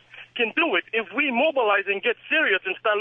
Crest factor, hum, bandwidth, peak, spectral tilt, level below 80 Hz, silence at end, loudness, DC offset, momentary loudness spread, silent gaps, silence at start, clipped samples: 16 dB; none; 4.1 kHz; -8 dBFS; -6 dB/octave; -80 dBFS; 0 s; -22 LUFS; under 0.1%; 5 LU; none; 0.15 s; under 0.1%